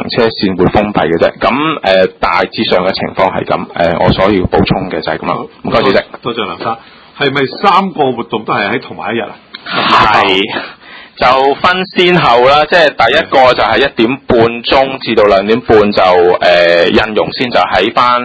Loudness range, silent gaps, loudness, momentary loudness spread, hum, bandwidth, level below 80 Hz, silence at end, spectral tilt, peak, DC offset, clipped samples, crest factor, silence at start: 5 LU; none; -10 LUFS; 10 LU; none; 8 kHz; -34 dBFS; 0 s; -6 dB/octave; 0 dBFS; under 0.1%; 0.8%; 10 dB; 0 s